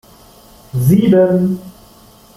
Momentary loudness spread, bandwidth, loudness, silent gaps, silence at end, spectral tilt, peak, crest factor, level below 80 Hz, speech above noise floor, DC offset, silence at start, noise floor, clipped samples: 14 LU; 15.5 kHz; -13 LUFS; none; 0.65 s; -8.5 dB/octave; -2 dBFS; 14 dB; -46 dBFS; 32 dB; under 0.1%; 0.75 s; -44 dBFS; under 0.1%